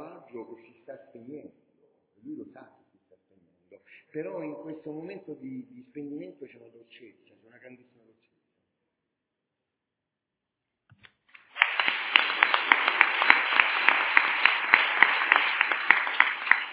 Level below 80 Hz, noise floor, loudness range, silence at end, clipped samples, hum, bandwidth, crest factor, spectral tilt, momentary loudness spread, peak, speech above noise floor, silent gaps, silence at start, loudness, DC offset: -80 dBFS; -86 dBFS; 24 LU; 0 s; under 0.1%; none; 4 kHz; 28 dB; 2 dB/octave; 24 LU; 0 dBFS; 44 dB; none; 0 s; -22 LUFS; under 0.1%